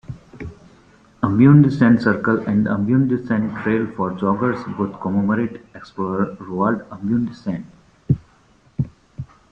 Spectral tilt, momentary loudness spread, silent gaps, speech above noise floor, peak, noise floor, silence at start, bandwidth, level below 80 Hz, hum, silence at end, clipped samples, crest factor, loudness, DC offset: -10 dB/octave; 22 LU; none; 36 dB; -2 dBFS; -54 dBFS; 0.1 s; 7 kHz; -50 dBFS; none; 0.25 s; under 0.1%; 18 dB; -19 LUFS; under 0.1%